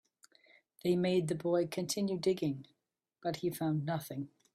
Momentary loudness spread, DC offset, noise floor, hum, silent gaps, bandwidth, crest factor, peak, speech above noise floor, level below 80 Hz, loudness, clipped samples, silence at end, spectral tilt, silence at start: 9 LU; under 0.1%; -67 dBFS; none; none; 15.5 kHz; 16 dB; -18 dBFS; 33 dB; -74 dBFS; -35 LUFS; under 0.1%; 0.25 s; -6 dB/octave; 0.85 s